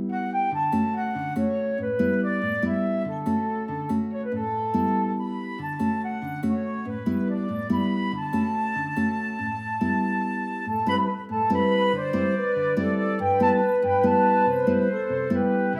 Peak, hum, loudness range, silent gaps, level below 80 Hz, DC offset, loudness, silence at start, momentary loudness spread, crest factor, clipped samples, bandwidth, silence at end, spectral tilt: -8 dBFS; none; 5 LU; none; -60 dBFS; under 0.1%; -25 LUFS; 0 s; 8 LU; 16 dB; under 0.1%; 10.5 kHz; 0 s; -8 dB/octave